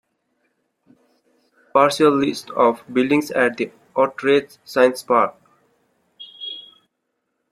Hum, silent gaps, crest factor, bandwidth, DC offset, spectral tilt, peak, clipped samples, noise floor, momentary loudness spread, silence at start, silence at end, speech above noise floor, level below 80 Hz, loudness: none; none; 20 dB; 15 kHz; under 0.1%; -4.5 dB/octave; -2 dBFS; under 0.1%; -75 dBFS; 15 LU; 1.75 s; 0.9 s; 57 dB; -66 dBFS; -19 LUFS